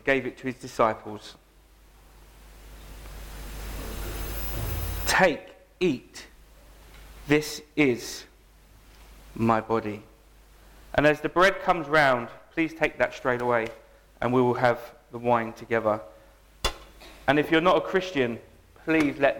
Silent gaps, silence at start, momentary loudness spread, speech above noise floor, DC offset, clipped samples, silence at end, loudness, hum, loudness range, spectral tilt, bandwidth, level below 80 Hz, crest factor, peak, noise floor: none; 0.05 s; 20 LU; 31 dB; under 0.1%; under 0.1%; 0 s; -26 LUFS; none; 9 LU; -5 dB/octave; 17.5 kHz; -44 dBFS; 22 dB; -6 dBFS; -55 dBFS